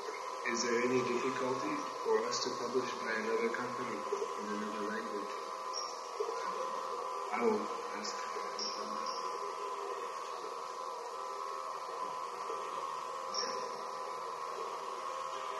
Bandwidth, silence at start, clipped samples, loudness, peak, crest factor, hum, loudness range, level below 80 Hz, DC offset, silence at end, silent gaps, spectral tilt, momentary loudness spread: 12 kHz; 0 s; under 0.1%; -38 LUFS; -18 dBFS; 18 dB; none; 6 LU; -86 dBFS; under 0.1%; 0 s; none; -3 dB/octave; 8 LU